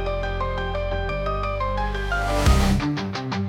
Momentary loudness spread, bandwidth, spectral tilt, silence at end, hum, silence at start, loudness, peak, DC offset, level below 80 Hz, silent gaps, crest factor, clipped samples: 7 LU; 16.5 kHz; -5.5 dB/octave; 0 s; none; 0 s; -24 LUFS; -6 dBFS; under 0.1%; -26 dBFS; none; 16 dB; under 0.1%